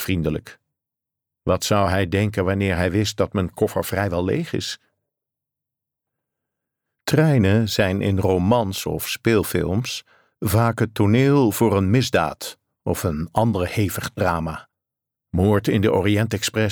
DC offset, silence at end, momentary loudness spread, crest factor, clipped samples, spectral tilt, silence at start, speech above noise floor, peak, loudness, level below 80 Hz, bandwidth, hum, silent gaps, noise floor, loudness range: under 0.1%; 0 s; 11 LU; 16 dB; under 0.1%; -6 dB/octave; 0 s; 66 dB; -6 dBFS; -21 LUFS; -44 dBFS; over 20 kHz; none; none; -86 dBFS; 6 LU